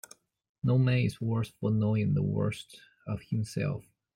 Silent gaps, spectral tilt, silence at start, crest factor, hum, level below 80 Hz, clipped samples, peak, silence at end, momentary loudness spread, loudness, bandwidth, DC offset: none; -7.5 dB/octave; 0.65 s; 14 dB; none; -60 dBFS; under 0.1%; -16 dBFS; 0.35 s; 14 LU; -30 LUFS; 15.5 kHz; under 0.1%